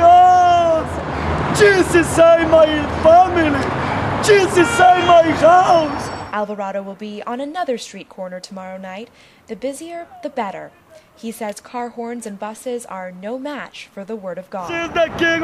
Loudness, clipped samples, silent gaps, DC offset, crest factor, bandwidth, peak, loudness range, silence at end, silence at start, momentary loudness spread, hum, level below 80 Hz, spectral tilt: -14 LUFS; under 0.1%; none; under 0.1%; 14 dB; 13 kHz; -2 dBFS; 16 LU; 0 s; 0 s; 20 LU; none; -42 dBFS; -5 dB/octave